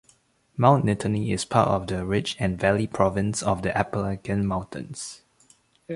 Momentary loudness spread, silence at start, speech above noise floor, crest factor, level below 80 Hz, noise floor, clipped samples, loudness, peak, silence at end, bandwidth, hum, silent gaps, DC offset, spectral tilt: 14 LU; 0.55 s; 38 dB; 22 dB; -46 dBFS; -62 dBFS; under 0.1%; -24 LUFS; -2 dBFS; 0 s; 11.5 kHz; none; none; under 0.1%; -6 dB/octave